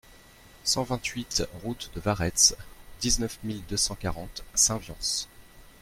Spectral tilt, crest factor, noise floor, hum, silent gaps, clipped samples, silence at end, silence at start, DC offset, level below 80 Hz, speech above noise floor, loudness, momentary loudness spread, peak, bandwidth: -2 dB/octave; 24 dB; -53 dBFS; none; none; under 0.1%; 0.1 s; 0.1 s; under 0.1%; -44 dBFS; 24 dB; -27 LUFS; 15 LU; -6 dBFS; 16.5 kHz